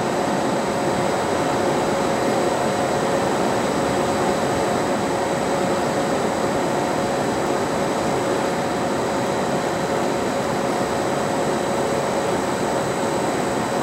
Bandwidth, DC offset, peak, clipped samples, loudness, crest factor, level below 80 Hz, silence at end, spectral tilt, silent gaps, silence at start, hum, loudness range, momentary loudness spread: 16 kHz; under 0.1%; -8 dBFS; under 0.1%; -21 LUFS; 14 dB; -50 dBFS; 0 s; -4.5 dB/octave; none; 0 s; none; 1 LU; 2 LU